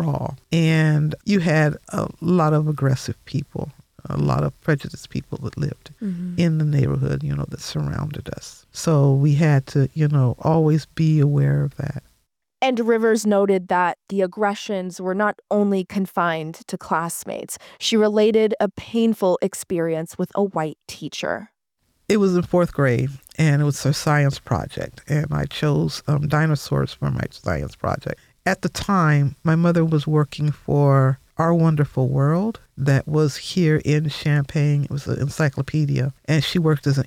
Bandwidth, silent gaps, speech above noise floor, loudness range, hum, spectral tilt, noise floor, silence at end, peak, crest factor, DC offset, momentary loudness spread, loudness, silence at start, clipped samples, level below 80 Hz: 15 kHz; none; 48 dB; 5 LU; none; -6.5 dB/octave; -69 dBFS; 0 s; -8 dBFS; 12 dB; under 0.1%; 11 LU; -21 LUFS; 0 s; under 0.1%; -48 dBFS